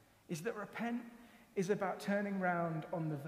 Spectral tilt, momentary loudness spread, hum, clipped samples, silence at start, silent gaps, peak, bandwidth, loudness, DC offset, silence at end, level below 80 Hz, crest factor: -6.5 dB/octave; 9 LU; none; under 0.1%; 0.3 s; none; -22 dBFS; 15.5 kHz; -39 LUFS; under 0.1%; 0 s; -78 dBFS; 18 dB